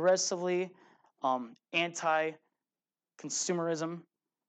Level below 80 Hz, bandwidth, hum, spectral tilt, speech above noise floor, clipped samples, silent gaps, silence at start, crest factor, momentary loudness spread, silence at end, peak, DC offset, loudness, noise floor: under -90 dBFS; 9.4 kHz; none; -3 dB/octave; over 58 dB; under 0.1%; none; 0 s; 18 dB; 10 LU; 0.45 s; -16 dBFS; under 0.1%; -33 LUFS; under -90 dBFS